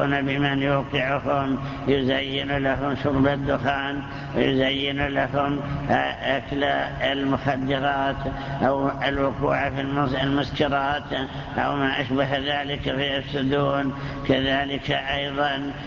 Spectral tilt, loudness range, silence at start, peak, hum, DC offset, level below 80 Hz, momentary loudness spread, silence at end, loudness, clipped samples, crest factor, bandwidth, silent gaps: -7 dB/octave; 1 LU; 0 s; -6 dBFS; none; under 0.1%; -42 dBFS; 5 LU; 0 s; -24 LUFS; under 0.1%; 18 dB; 7.2 kHz; none